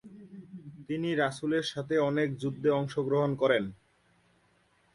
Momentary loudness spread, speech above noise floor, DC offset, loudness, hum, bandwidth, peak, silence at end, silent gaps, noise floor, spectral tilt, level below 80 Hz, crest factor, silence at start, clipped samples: 20 LU; 39 dB; under 0.1%; -30 LUFS; none; 11.5 kHz; -12 dBFS; 1.2 s; none; -68 dBFS; -6.5 dB/octave; -68 dBFS; 18 dB; 0.05 s; under 0.1%